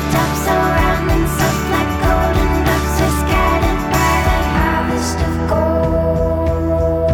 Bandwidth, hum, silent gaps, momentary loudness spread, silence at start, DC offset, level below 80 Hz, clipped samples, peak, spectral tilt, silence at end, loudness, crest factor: over 20 kHz; none; none; 3 LU; 0 s; under 0.1%; -22 dBFS; under 0.1%; -4 dBFS; -5.5 dB/octave; 0 s; -16 LUFS; 10 dB